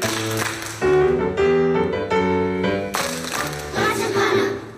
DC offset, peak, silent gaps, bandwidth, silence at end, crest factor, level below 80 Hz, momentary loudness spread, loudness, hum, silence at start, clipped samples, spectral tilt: under 0.1%; -8 dBFS; none; 15.5 kHz; 0 s; 12 dB; -46 dBFS; 7 LU; -20 LUFS; none; 0 s; under 0.1%; -4.5 dB/octave